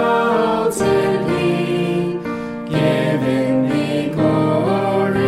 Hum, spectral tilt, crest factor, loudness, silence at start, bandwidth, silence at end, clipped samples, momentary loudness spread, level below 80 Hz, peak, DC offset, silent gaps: none; -6.5 dB/octave; 12 dB; -18 LUFS; 0 s; 14.5 kHz; 0 s; under 0.1%; 5 LU; -50 dBFS; -4 dBFS; under 0.1%; none